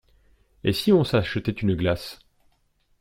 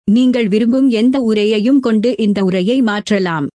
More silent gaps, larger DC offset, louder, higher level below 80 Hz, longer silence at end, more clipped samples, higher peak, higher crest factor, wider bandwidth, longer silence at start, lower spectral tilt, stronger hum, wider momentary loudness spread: neither; neither; second, -23 LUFS vs -13 LUFS; first, -48 dBFS vs -54 dBFS; first, 0.85 s vs 0.1 s; neither; about the same, -6 dBFS vs -4 dBFS; first, 18 dB vs 10 dB; first, 16.5 kHz vs 10.5 kHz; first, 0.65 s vs 0.05 s; about the same, -6.5 dB/octave vs -6.5 dB/octave; neither; first, 10 LU vs 3 LU